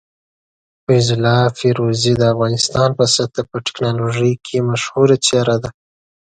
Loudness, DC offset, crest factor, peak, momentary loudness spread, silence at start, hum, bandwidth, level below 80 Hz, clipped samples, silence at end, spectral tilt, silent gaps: -16 LUFS; under 0.1%; 16 dB; 0 dBFS; 8 LU; 0.9 s; none; 9.4 kHz; -48 dBFS; under 0.1%; 0.5 s; -5 dB/octave; none